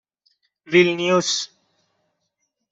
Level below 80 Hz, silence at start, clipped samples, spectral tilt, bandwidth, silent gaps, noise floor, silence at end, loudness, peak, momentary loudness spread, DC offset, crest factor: -66 dBFS; 0.7 s; under 0.1%; -3.5 dB/octave; 8 kHz; none; -75 dBFS; 1.25 s; -19 LUFS; -2 dBFS; 8 LU; under 0.1%; 20 dB